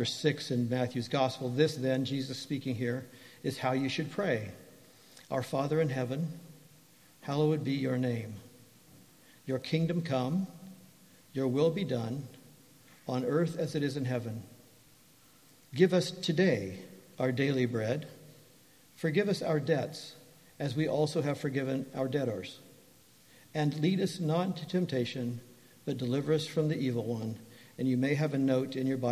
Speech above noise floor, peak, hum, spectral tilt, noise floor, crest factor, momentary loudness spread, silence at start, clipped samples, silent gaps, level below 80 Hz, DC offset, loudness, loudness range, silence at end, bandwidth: 30 dB; -10 dBFS; none; -6.5 dB/octave; -61 dBFS; 22 dB; 13 LU; 0 s; under 0.1%; none; -70 dBFS; under 0.1%; -32 LUFS; 4 LU; 0 s; 15.5 kHz